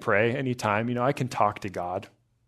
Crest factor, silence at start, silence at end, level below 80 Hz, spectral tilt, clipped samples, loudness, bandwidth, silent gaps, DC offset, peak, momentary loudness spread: 20 dB; 0 s; 0.4 s; -66 dBFS; -6 dB/octave; under 0.1%; -27 LUFS; 13.5 kHz; none; under 0.1%; -8 dBFS; 10 LU